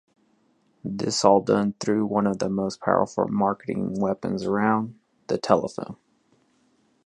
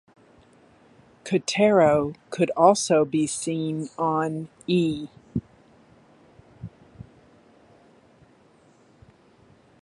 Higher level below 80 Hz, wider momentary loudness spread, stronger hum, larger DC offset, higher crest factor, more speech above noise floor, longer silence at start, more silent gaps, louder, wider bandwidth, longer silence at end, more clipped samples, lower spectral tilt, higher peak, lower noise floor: about the same, -60 dBFS vs -58 dBFS; second, 14 LU vs 18 LU; neither; neither; about the same, 22 dB vs 22 dB; first, 42 dB vs 35 dB; second, 0.85 s vs 1.25 s; neither; about the same, -24 LUFS vs -23 LUFS; about the same, 10.5 kHz vs 11.5 kHz; second, 1.1 s vs 2.8 s; neither; about the same, -5.5 dB/octave vs -5 dB/octave; about the same, -2 dBFS vs -4 dBFS; first, -65 dBFS vs -57 dBFS